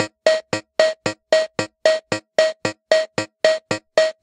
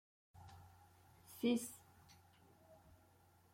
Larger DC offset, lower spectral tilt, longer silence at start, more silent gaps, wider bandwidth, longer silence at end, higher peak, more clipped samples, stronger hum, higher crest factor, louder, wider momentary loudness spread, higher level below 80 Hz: neither; second, -3 dB/octave vs -4.5 dB/octave; second, 0 s vs 0.35 s; neither; second, 10.5 kHz vs 16.5 kHz; second, 0.1 s vs 0.8 s; first, 0 dBFS vs -26 dBFS; neither; neither; about the same, 20 dB vs 22 dB; first, -20 LUFS vs -41 LUFS; second, 6 LU vs 28 LU; first, -66 dBFS vs -80 dBFS